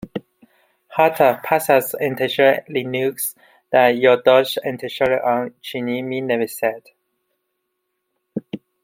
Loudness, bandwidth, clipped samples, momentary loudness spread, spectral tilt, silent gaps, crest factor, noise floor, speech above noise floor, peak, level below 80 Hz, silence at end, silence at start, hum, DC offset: -18 LUFS; 16.5 kHz; under 0.1%; 16 LU; -4 dB/octave; none; 18 dB; -75 dBFS; 57 dB; -2 dBFS; -64 dBFS; 0.25 s; 0.05 s; none; under 0.1%